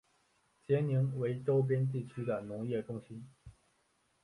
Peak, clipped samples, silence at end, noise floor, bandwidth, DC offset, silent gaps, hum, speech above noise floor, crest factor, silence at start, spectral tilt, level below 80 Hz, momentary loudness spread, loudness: -20 dBFS; under 0.1%; 0.75 s; -75 dBFS; 11 kHz; under 0.1%; none; none; 41 dB; 16 dB; 0.7 s; -9.5 dB/octave; -70 dBFS; 14 LU; -35 LUFS